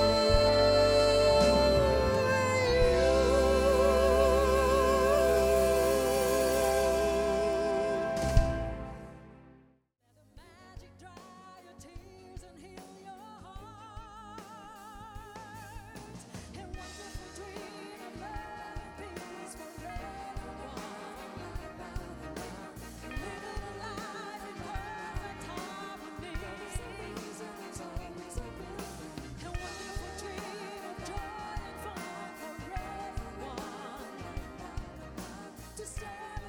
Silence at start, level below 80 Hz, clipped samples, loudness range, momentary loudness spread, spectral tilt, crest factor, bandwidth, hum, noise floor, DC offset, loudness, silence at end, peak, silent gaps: 0 s; -42 dBFS; under 0.1%; 22 LU; 23 LU; -4.5 dB/octave; 22 dB; over 20 kHz; none; -68 dBFS; under 0.1%; -30 LUFS; 0 s; -10 dBFS; none